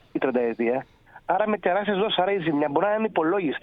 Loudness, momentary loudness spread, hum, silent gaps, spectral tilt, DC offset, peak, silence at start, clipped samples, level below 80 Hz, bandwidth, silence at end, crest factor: -24 LUFS; 4 LU; none; none; -8.5 dB/octave; under 0.1%; -8 dBFS; 0.15 s; under 0.1%; -62 dBFS; 5 kHz; 0.05 s; 16 dB